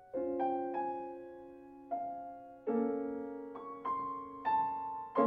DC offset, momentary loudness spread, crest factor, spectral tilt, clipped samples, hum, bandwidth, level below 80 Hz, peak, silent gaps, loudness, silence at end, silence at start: under 0.1%; 15 LU; 20 dB; -8.5 dB/octave; under 0.1%; none; 4.8 kHz; -74 dBFS; -18 dBFS; none; -38 LUFS; 0 s; 0 s